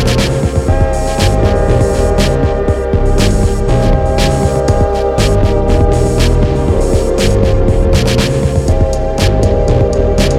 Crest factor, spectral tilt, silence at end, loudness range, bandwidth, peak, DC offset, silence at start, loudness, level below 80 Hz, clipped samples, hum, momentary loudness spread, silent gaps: 10 dB; -6 dB/octave; 0 s; 1 LU; 15 kHz; 0 dBFS; under 0.1%; 0 s; -12 LUFS; -14 dBFS; under 0.1%; none; 2 LU; none